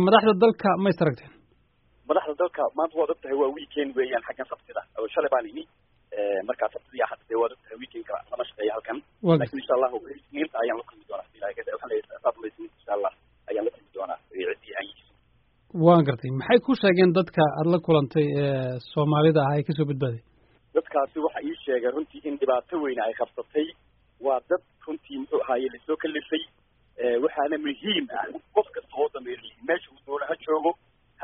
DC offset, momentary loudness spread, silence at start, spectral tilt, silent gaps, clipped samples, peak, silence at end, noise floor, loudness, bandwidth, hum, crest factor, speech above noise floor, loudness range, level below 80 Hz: under 0.1%; 15 LU; 0 s; -5 dB/octave; none; under 0.1%; -4 dBFS; 0 s; -64 dBFS; -26 LUFS; 5 kHz; none; 22 dB; 38 dB; 9 LU; -64 dBFS